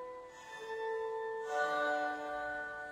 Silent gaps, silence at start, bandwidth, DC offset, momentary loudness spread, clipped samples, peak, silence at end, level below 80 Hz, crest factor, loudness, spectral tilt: none; 0 s; 15.5 kHz; under 0.1%; 14 LU; under 0.1%; -22 dBFS; 0 s; -72 dBFS; 16 dB; -38 LUFS; -3 dB/octave